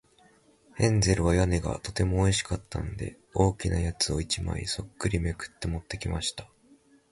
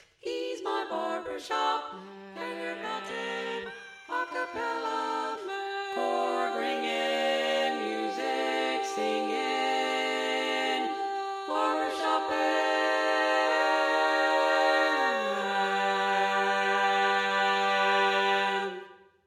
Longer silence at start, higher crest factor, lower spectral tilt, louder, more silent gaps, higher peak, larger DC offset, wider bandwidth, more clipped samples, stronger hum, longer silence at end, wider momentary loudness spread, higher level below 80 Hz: first, 0.75 s vs 0.25 s; first, 22 dB vs 16 dB; first, -5 dB/octave vs -2.5 dB/octave; about the same, -28 LUFS vs -28 LUFS; neither; first, -8 dBFS vs -14 dBFS; neither; second, 11.5 kHz vs 15 kHz; neither; neither; first, 0.65 s vs 0.3 s; about the same, 11 LU vs 10 LU; first, -38 dBFS vs -78 dBFS